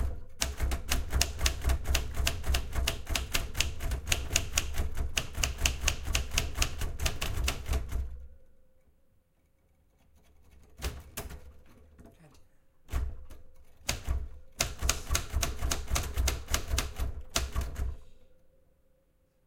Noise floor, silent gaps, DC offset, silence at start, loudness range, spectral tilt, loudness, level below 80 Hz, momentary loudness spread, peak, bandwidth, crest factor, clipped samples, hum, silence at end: -69 dBFS; none; under 0.1%; 0 s; 16 LU; -2.5 dB/octave; -33 LUFS; -36 dBFS; 11 LU; -4 dBFS; 17 kHz; 28 dB; under 0.1%; none; 1.1 s